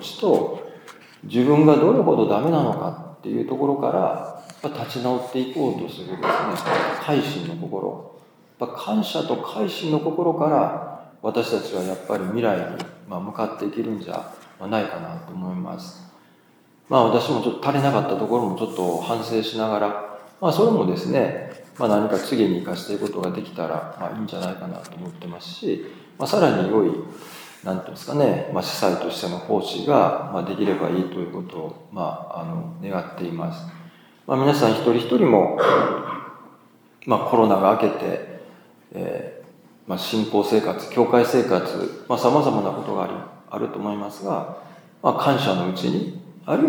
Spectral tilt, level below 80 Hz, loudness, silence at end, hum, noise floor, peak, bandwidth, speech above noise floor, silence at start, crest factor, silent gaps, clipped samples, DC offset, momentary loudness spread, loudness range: -6.5 dB/octave; -72 dBFS; -22 LUFS; 0 s; none; -55 dBFS; 0 dBFS; over 20 kHz; 34 dB; 0 s; 22 dB; none; under 0.1%; under 0.1%; 16 LU; 7 LU